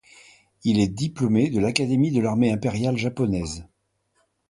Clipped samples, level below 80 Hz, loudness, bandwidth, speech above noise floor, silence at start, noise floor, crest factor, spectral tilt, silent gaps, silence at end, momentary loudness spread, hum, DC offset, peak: under 0.1%; -48 dBFS; -23 LUFS; 11.5 kHz; 48 dB; 0.65 s; -70 dBFS; 20 dB; -6 dB/octave; none; 0.85 s; 7 LU; none; under 0.1%; -4 dBFS